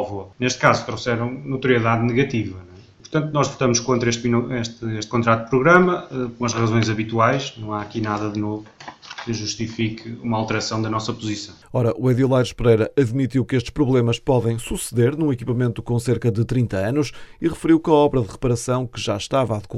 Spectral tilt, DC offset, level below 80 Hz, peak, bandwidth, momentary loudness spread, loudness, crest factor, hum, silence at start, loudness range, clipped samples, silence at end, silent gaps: -6 dB/octave; under 0.1%; -44 dBFS; 0 dBFS; 13 kHz; 10 LU; -21 LUFS; 20 dB; none; 0 s; 5 LU; under 0.1%; 0 s; none